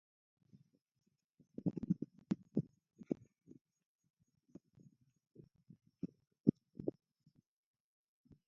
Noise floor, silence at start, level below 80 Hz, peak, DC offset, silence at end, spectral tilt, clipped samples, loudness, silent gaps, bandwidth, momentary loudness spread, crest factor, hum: -69 dBFS; 1.65 s; -76 dBFS; -14 dBFS; under 0.1%; 1.55 s; -11.5 dB/octave; under 0.1%; -43 LUFS; 3.61-3.65 s, 3.85-3.99 s, 4.10-4.14 s; 7 kHz; 26 LU; 32 dB; none